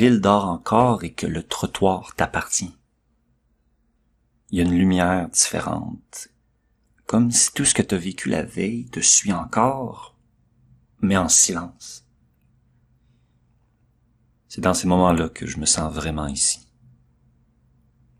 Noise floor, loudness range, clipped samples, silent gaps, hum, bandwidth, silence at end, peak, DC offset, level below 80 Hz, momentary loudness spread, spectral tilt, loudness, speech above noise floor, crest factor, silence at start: -66 dBFS; 6 LU; under 0.1%; none; none; 14.5 kHz; 1.65 s; 0 dBFS; under 0.1%; -46 dBFS; 19 LU; -3.5 dB/octave; -20 LUFS; 45 dB; 22 dB; 0 s